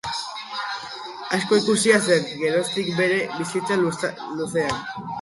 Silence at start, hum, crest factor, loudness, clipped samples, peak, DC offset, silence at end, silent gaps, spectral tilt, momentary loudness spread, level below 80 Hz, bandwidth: 0.05 s; none; 20 dB; -23 LUFS; under 0.1%; -4 dBFS; under 0.1%; 0 s; none; -4 dB/octave; 12 LU; -60 dBFS; 11.5 kHz